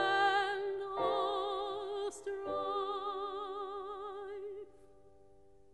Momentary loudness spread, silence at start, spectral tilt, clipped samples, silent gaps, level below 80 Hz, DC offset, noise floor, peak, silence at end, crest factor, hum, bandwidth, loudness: 13 LU; 0 s; -3 dB/octave; under 0.1%; none; -70 dBFS; under 0.1%; -64 dBFS; -20 dBFS; 0.9 s; 18 dB; none; 11.5 kHz; -37 LUFS